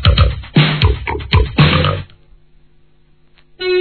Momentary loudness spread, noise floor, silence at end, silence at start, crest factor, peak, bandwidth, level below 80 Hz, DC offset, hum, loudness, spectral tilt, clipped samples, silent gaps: 9 LU; -52 dBFS; 0 s; 0 s; 14 dB; 0 dBFS; 4.6 kHz; -22 dBFS; 0.3%; none; -14 LUFS; -9 dB/octave; under 0.1%; none